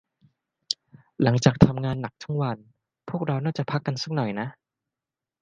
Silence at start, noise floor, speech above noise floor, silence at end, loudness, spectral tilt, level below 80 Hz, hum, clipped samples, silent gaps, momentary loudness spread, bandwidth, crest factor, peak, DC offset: 0.7 s; -89 dBFS; 65 dB; 0.9 s; -25 LUFS; -6.5 dB/octave; -48 dBFS; none; under 0.1%; none; 13 LU; 9.4 kHz; 24 dB; -2 dBFS; under 0.1%